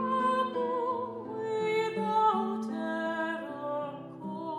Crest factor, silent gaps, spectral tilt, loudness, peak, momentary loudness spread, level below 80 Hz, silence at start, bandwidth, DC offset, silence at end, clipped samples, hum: 14 dB; none; -6 dB/octave; -31 LUFS; -16 dBFS; 11 LU; -80 dBFS; 0 s; 12.5 kHz; under 0.1%; 0 s; under 0.1%; none